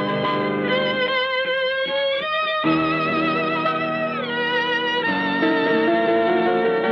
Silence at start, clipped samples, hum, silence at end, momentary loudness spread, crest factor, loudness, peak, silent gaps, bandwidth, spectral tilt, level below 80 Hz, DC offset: 0 s; under 0.1%; none; 0 s; 3 LU; 12 dB; -20 LUFS; -8 dBFS; none; 6.6 kHz; -6.5 dB/octave; -60 dBFS; under 0.1%